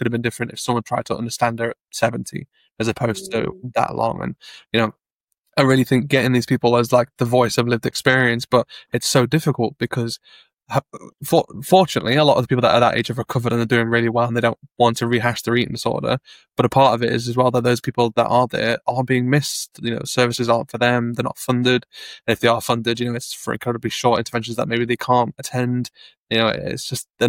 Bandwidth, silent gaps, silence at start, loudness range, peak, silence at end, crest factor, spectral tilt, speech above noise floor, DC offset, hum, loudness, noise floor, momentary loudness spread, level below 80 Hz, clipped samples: 17 kHz; 5.13-5.28 s, 5.39-5.43 s, 26.19-26.27 s; 0 s; 5 LU; -2 dBFS; 0 s; 18 dB; -5 dB/octave; 55 dB; under 0.1%; none; -19 LUFS; -74 dBFS; 10 LU; -54 dBFS; under 0.1%